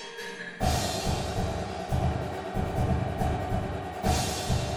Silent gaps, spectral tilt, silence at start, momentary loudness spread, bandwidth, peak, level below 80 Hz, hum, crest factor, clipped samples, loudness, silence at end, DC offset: none; -5 dB/octave; 0 s; 6 LU; 18 kHz; -14 dBFS; -36 dBFS; none; 16 dB; under 0.1%; -30 LUFS; 0 s; under 0.1%